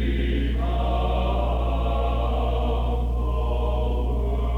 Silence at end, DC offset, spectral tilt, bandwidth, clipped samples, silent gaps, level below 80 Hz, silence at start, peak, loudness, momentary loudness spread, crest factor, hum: 0 s; under 0.1%; -8.5 dB/octave; 4.1 kHz; under 0.1%; none; -24 dBFS; 0 s; -12 dBFS; -25 LUFS; 2 LU; 10 dB; 60 Hz at -25 dBFS